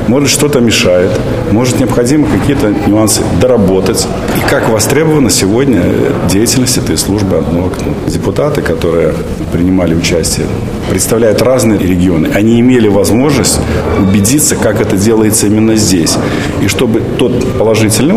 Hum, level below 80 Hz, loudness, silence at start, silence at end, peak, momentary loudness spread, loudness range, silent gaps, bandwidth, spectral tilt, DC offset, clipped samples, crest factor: none; -26 dBFS; -9 LUFS; 0 s; 0 s; 0 dBFS; 5 LU; 3 LU; none; 16 kHz; -5 dB/octave; 1%; under 0.1%; 8 dB